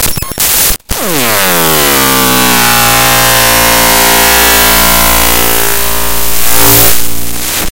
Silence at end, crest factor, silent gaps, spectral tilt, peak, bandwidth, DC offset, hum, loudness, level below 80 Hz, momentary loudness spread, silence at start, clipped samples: 0.05 s; 6 dB; none; -1.5 dB/octave; 0 dBFS; over 20 kHz; under 0.1%; none; -6 LUFS; -24 dBFS; 8 LU; 0 s; 4%